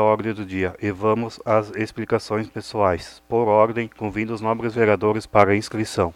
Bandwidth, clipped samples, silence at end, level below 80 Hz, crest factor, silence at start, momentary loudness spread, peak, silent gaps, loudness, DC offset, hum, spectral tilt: 13.5 kHz; under 0.1%; 0.05 s; -52 dBFS; 22 dB; 0 s; 9 LU; 0 dBFS; none; -22 LUFS; under 0.1%; none; -6.5 dB/octave